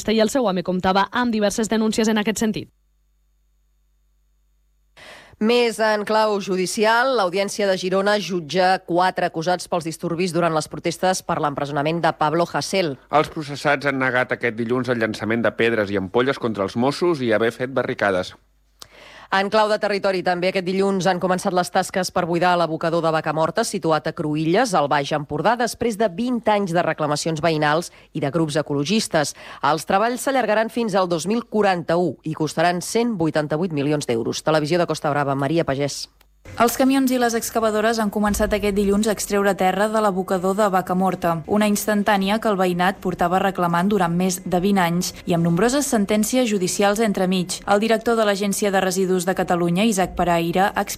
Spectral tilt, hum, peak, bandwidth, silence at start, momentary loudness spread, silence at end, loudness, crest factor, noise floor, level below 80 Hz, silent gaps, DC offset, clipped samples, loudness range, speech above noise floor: -4.5 dB/octave; none; -6 dBFS; 16 kHz; 0 s; 5 LU; 0 s; -20 LUFS; 14 dB; -63 dBFS; -48 dBFS; none; under 0.1%; under 0.1%; 2 LU; 43 dB